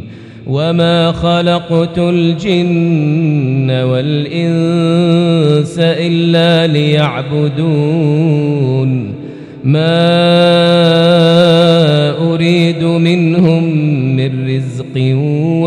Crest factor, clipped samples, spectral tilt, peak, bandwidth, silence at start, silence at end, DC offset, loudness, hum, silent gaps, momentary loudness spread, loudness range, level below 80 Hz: 10 dB; 0.3%; -7.5 dB/octave; 0 dBFS; 9.8 kHz; 0 s; 0 s; under 0.1%; -11 LUFS; none; none; 7 LU; 4 LU; -44 dBFS